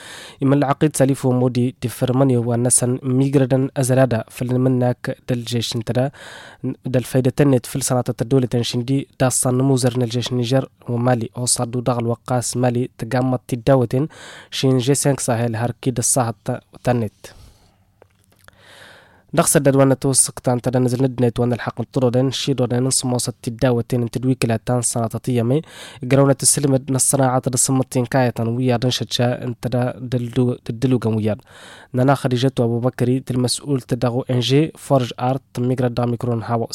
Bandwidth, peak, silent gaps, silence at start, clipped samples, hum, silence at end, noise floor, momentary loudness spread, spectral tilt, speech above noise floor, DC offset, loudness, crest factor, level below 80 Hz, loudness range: 16 kHz; -2 dBFS; none; 0 s; under 0.1%; none; 0 s; -55 dBFS; 7 LU; -5 dB/octave; 37 dB; under 0.1%; -19 LUFS; 16 dB; -50 dBFS; 4 LU